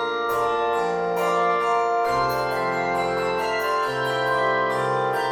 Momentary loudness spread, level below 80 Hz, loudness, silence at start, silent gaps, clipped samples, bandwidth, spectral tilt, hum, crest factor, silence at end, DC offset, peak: 3 LU; -54 dBFS; -23 LUFS; 0 s; none; under 0.1%; 17.5 kHz; -4.5 dB/octave; none; 12 dB; 0 s; under 0.1%; -10 dBFS